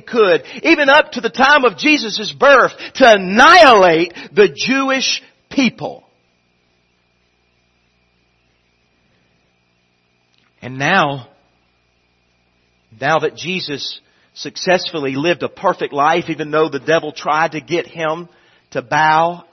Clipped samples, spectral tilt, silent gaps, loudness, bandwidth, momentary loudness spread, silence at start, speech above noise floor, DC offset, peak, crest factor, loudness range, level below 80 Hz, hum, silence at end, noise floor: under 0.1%; -4 dB/octave; none; -13 LUFS; 12 kHz; 14 LU; 0.05 s; 47 dB; under 0.1%; 0 dBFS; 16 dB; 13 LU; -56 dBFS; 60 Hz at -55 dBFS; 0.1 s; -61 dBFS